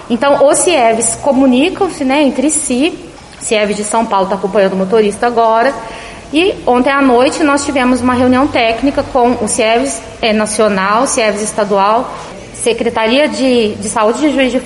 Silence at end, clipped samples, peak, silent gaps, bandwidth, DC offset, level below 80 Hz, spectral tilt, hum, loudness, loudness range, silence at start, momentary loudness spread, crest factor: 0 s; under 0.1%; 0 dBFS; none; 11.5 kHz; under 0.1%; -40 dBFS; -3.5 dB/octave; none; -12 LUFS; 2 LU; 0 s; 6 LU; 12 dB